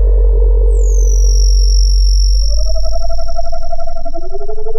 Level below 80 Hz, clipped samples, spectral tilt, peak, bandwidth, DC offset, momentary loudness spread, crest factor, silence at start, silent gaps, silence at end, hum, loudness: -10 dBFS; under 0.1%; -5 dB/octave; -2 dBFS; 7.2 kHz; under 0.1%; 13 LU; 6 dB; 0 s; none; 0 s; none; -15 LUFS